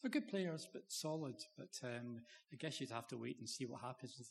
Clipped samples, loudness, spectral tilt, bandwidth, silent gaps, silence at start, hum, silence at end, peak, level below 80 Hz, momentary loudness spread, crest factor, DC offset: under 0.1%; -47 LUFS; -4.5 dB/octave; 13 kHz; none; 0 s; none; 0 s; -28 dBFS; under -90 dBFS; 9 LU; 20 dB; under 0.1%